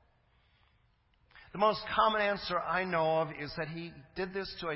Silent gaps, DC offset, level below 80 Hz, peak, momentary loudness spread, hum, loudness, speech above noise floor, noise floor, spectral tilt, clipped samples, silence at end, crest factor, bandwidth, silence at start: none; under 0.1%; -62 dBFS; -14 dBFS; 12 LU; none; -32 LUFS; 38 dB; -70 dBFS; -8.5 dB/octave; under 0.1%; 0 s; 20 dB; 5.8 kHz; 1.35 s